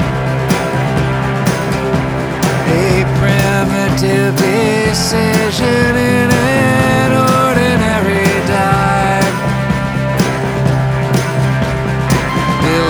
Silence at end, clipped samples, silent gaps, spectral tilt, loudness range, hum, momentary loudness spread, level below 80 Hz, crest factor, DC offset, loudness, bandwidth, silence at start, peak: 0 s; under 0.1%; none; -5.5 dB/octave; 3 LU; none; 4 LU; -30 dBFS; 12 dB; under 0.1%; -13 LUFS; over 20 kHz; 0 s; 0 dBFS